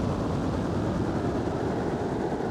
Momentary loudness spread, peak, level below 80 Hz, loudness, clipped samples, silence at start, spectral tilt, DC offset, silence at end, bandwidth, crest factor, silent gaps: 1 LU; -16 dBFS; -42 dBFS; -29 LUFS; under 0.1%; 0 s; -7.5 dB/octave; under 0.1%; 0 s; 12.5 kHz; 12 dB; none